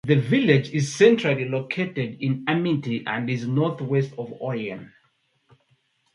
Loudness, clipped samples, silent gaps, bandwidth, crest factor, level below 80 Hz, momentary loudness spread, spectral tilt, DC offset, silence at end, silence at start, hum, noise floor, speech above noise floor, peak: -23 LUFS; under 0.1%; none; 11.5 kHz; 20 dB; -64 dBFS; 12 LU; -6.5 dB/octave; under 0.1%; 1.3 s; 0.05 s; none; -67 dBFS; 45 dB; -4 dBFS